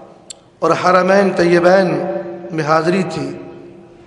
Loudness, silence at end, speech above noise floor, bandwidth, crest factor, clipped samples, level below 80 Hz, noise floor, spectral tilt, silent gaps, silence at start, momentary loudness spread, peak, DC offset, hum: -14 LUFS; 0.35 s; 26 dB; 11 kHz; 16 dB; under 0.1%; -58 dBFS; -39 dBFS; -6 dB/octave; none; 0 s; 15 LU; 0 dBFS; under 0.1%; none